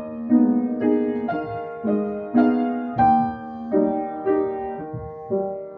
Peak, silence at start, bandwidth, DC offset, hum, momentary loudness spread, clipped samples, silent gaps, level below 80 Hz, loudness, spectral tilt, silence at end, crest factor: -6 dBFS; 0 s; 4.5 kHz; under 0.1%; none; 12 LU; under 0.1%; none; -54 dBFS; -22 LUFS; -10.5 dB/octave; 0 s; 16 dB